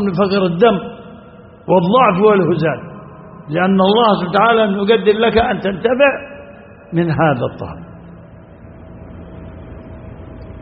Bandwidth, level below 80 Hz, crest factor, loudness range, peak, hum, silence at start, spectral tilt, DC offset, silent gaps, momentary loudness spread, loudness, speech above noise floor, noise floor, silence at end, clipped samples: 5.2 kHz; -42 dBFS; 16 dB; 9 LU; 0 dBFS; none; 0 s; -4.5 dB/octave; under 0.1%; none; 23 LU; -14 LUFS; 26 dB; -39 dBFS; 0 s; under 0.1%